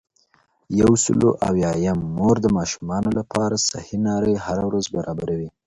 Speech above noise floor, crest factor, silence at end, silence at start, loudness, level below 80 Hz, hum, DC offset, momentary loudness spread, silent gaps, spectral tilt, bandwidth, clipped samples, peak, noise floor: 42 dB; 16 dB; 0.15 s; 0.7 s; -21 LUFS; -44 dBFS; none; under 0.1%; 9 LU; none; -5.5 dB/octave; 11.5 kHz; under 0.1%; -4 dBFS; -62 dBFS